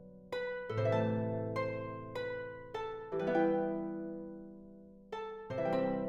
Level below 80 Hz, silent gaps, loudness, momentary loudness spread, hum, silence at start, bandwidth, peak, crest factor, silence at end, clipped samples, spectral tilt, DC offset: -64 dBFS; none; -37 LUFS; 15 LU; none; 0 s; 7.4 kHz; -20 dBFS; 18 dB; 0 s; under 0.1%; -8 dB/octave; under 0.1%